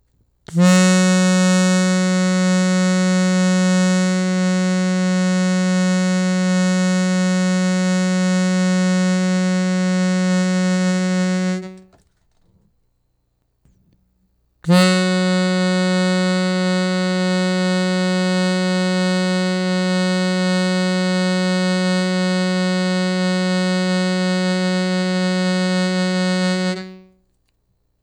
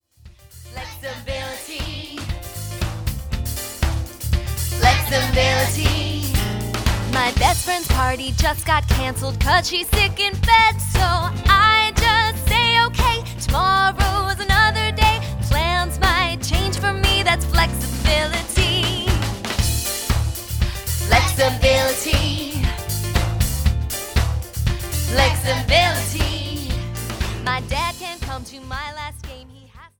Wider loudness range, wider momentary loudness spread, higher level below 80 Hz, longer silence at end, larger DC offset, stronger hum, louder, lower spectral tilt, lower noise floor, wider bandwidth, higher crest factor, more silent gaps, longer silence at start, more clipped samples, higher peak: second, 5 LU vs 9 LU; second, 4 LU vs 13 LU; second, -64 dBFS vs -26 dBFS; first, 1.05 s vs 0.15 s; neither; neither; about the same, -17 LUFS vs -19 LUFS; first, -5.5 dB/octave vs -3.5 dB/octave; first, -67 dBFS vs -46 dBFS; second, 11.5 kHz vs over 20 kHz; about the same, 16 dB vs 18 dB; neither; first, 0.5 s vs 0.25 s; neither; about the same, -2 dBFS vs 0 dBFS